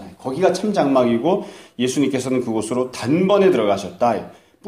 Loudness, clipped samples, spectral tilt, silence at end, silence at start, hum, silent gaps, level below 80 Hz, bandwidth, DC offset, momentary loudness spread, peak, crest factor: -19 LUFS; under 0.1%; -5.5 dB/octave; 0 s; 0 s; none; none; -60 dBFS; 15 kHz; under 0.1%; 9 LU; -2 dBFS; 16 dB